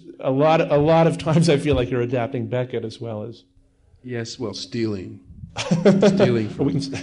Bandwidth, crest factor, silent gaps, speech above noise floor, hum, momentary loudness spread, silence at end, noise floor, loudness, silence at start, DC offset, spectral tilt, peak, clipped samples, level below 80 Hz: 11 kHz; 16 dB; none; 36 dB; none; 16 LU; 0 s; -56 dBFS; -20 LUFS; 0.05 s; under 0.1%; -6.5 dB/octave; -4 dBFS; under 0.1%; -46 dBFS